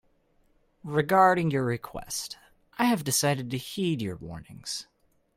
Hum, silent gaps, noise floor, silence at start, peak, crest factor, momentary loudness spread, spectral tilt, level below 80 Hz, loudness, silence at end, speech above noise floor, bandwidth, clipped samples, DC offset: none; none; -66 dBFS; 0.85 s; -8 dBFS; 20 dB; 19 LU; -4.5 dB/octave; -60 dBFS; -27 LUFS; 0.55 s; 39 dB; 16.5 kHz; under 0.1%; under 0.1%